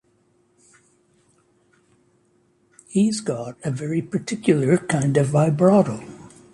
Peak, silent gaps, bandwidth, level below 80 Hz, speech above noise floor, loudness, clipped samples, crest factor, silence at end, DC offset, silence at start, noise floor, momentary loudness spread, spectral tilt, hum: -4 dBFS; none; 11.5 kHz; -60 dBFS; 43 dB; -21 LUFS; under 0.1%; 18 dB; 0.25 s; under 0.1%; 2.9 s; -63 dBFS; 12 LU; -7 dB/octave; none